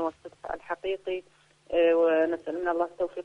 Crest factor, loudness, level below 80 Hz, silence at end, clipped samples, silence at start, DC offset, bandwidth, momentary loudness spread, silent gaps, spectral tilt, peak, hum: 14 dB; -28 LUFS; -62 dBFS; 0 s; under 0.1%; 0 s; under 0.1%; 6.6 kHz; 15 LU; none; -5.5 dB/octave; -14 dBFS; none